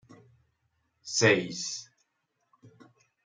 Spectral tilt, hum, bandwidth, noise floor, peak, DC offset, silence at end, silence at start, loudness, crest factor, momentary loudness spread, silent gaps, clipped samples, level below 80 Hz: -3 dB/octave; none; 10 kHz; -78 dBFS; -10 dBFS; under 0.1%; 0.55 s; 1.05 s; -27 LUFS; 24 dB; 17 LU; none; under 0.1%; -72 dBFS